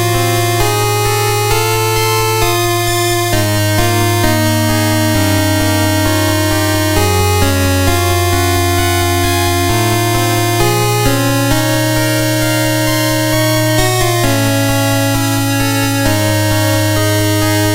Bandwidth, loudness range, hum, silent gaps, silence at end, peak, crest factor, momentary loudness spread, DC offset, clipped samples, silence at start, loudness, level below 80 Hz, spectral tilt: 16.5 kHz; 0 LU; none; none; 0 s; 0 dBFS; 12 dB; 1 LU; under 0.1%; under 0.1%; 0 s; -12 LUFS; -30 dBFS; -4.5 dB/octave